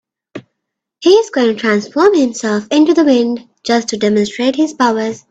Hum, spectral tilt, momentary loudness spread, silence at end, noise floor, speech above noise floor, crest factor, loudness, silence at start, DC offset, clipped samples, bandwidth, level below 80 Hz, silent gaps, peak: none; -4.5 dB/octave; 6 LU; 0.1 s; -76 dBFS; 64 dB; 14 dB; -13 LUFS; 0.35 s; under 0.1%; under 0.1%; 8.8 kHz; -58 dBFS; none; 0 dBFS